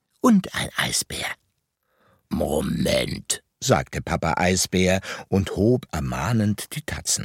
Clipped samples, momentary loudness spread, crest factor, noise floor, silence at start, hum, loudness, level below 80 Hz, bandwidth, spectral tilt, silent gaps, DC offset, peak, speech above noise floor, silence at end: under 0.1%; 8 LU; 22 dB; -73 dBFS; 0.25 s; none; -23 LUFS; -42 dBFS; 17 kHz; -4.5 dB/octave; none; under 0.1%; -2 dBFS; 50 dB; 0 s